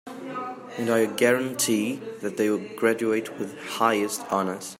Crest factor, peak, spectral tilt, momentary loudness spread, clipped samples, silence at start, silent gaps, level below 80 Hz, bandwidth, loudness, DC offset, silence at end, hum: 20 dB; -6 dBFS; -3.5 dB/octave; 12 LU; under 0.1%; 0.05 s; none; -74 dBFS; 16 kHz; -25 LUFS; under 0.1%; 0.05 s; none